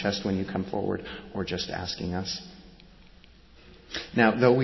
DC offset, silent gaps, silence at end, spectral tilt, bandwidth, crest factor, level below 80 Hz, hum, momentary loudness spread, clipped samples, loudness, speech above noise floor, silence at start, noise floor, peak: under 0.1%; none; 0 s; -5.5 dB/octave; 6.2 kHz; 22 dB; -50 dBFS; none; 14 LU; under 0.1%; -29 LUFS; 26 dB; 0 s; -53 dBFS; -6 dBFS